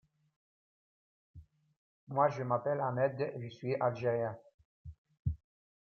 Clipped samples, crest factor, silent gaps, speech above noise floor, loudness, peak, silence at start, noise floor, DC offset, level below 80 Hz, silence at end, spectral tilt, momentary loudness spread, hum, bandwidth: under 0.1%; 22 dB; 1.77-2.07 s, 4.54-4.58 s, 4.65-4.85 s, 4.98-5.05 s, 5.19-5.25 s; over 57 dB; -35 LUFS; -16 dBFS; 1.35 s; under -90 dBFS; under 0.1%; -60 dBFS; 0.5 s; -8.5 dB/octave; 22 LU; none; 6.8 kHz